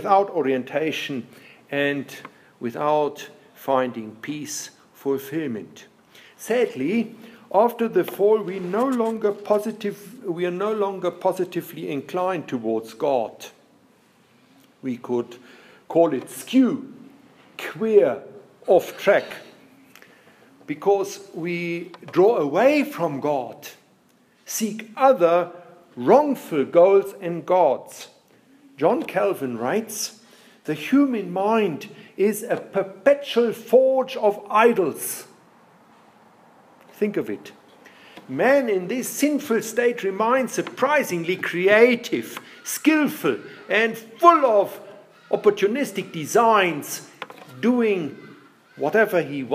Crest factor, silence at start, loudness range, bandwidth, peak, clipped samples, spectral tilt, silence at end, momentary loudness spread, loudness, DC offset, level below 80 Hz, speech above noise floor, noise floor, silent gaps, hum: 22 dB; 0 s; 7 LU; 15.5 kHz; -2 dBFS; under 0.1%; -4.5 dB/octave; 0 s; 16 LU; -22 LUFS; under 0.1%; -78 dBFS; 37 dB; -59 dBFS; none; none